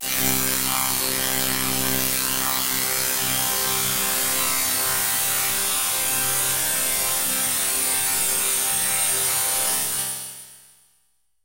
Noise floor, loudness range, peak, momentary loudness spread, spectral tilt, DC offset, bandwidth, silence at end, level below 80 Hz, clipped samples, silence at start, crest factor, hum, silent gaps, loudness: -68 dBFS; 1 LU; -4 dBFS; 2 LU; -0.5 dB/octave; under 0.1%; 16 kHz; 0.85 s; -52 dBFS; under 0.1%; 0 s; 20 dB; none; none; -20 LUFS